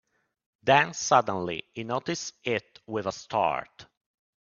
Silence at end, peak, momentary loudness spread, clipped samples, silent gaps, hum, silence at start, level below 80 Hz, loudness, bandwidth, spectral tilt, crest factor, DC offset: 0.6 s; -6 dBFS; 11 LU; under 0.1%; none; none; 0.65 s; -66 dBFS; -27 LUFS; 7.4 kHz; -3.5 dB/octave; 24 dB; under 0.1%